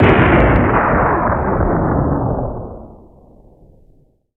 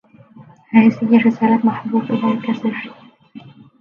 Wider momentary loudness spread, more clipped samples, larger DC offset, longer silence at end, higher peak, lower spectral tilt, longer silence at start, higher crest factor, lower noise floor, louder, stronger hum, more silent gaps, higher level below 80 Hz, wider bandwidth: first, 16 LU vs 10 LU; neither; neither; first, 1.4 s vs 0.3 s; about the same, 0 dBFS vs 0 dBFS; first, -10 dB/octave vs -8.5 dB/octave; second, 0 s vs 0.4 s; about the same, 14 dB vs 18 dB; first, -52 dBFS vs -44 dBFS; about the same, -15 LUFS vs -16 LUFS; neither; neither; first, -24 dBFS vs -64 dBFS; second, 4.3 kHz vs 5.4 kHz